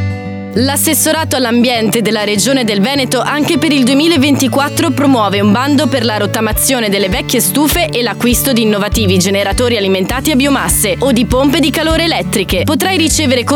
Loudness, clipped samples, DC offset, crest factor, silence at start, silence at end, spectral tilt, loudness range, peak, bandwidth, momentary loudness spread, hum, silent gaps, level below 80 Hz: -11 LUFS; under 0.1%; under 0.1%; 10 dB; 0 s; 0 s; -4 dB/octave; 1 LU; 0 dBFS; 20 kHz; 3 LU; none; none; -28 dBFS